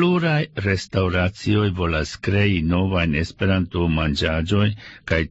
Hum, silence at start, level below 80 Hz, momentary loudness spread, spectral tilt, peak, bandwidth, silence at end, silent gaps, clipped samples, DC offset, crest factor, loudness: none; 0 s; -36 dBFS; 4 LU; -6.5 dB/octave; -6 dBFS; 8 kHz; 0 s; none; under 0.1%; under 0.1%; 14 dB; -21 LUFS